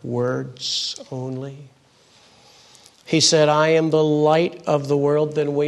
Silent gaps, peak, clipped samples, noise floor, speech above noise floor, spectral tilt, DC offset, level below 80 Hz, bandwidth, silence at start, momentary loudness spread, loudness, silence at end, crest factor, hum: none; -4 dBFS; under 0.1%; -54 dBFS; 35 dB; -4.5 dB/octave; under 0.1%; -66 dBFS; 12 kHz; 0.05 s; 14 LU; -19 LUFS; 0 s; 18 dB; none